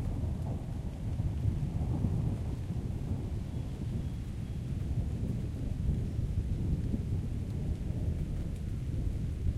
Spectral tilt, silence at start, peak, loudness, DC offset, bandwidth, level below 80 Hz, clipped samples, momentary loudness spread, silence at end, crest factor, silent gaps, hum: -8.5 dB/octave; 0 s; -16 dBFS; -36 LUFS; under 0.1%; 13 kHz; -38 dBFS; under 0.1%; 5 LU; 0 s; 16 dB; none; none